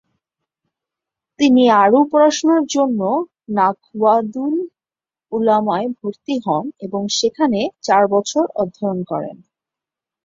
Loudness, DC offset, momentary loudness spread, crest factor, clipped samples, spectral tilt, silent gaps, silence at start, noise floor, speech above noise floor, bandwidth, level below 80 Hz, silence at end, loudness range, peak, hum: -17 LUFS; under 0.1%; 12 LU; 16 dB; under 0.1%; -4.5 dB/octave; none; 1.4 s; under -90 dBFS; over 74 dB; 7.8 kHz; -64 dBFS; 0.9 s; 5 LU; -2 dBFS; none